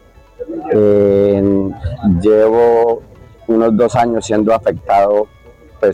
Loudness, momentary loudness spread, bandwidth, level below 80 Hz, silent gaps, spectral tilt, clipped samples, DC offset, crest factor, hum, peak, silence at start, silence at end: -13 LUFS; 12 LU; 9.8 kHz; -38 dBFS; none; -7.5 dB/octave; under 0.1%; under 0.1%; 12 dB; none; 0 dBFS; 0.4 s; 0 s